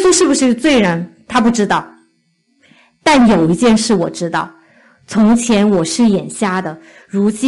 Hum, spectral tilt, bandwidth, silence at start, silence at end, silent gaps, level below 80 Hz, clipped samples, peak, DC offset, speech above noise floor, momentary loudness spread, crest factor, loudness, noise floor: none; -4.5 dB/octave; 11.5 kHz; 0 s; 0 s; none; -44 dBFS; under 0.1%; -2 dBFS; under 0.1%; 48 dB; 10 LU; 12 dB; -13 LUFS; -60 dBFS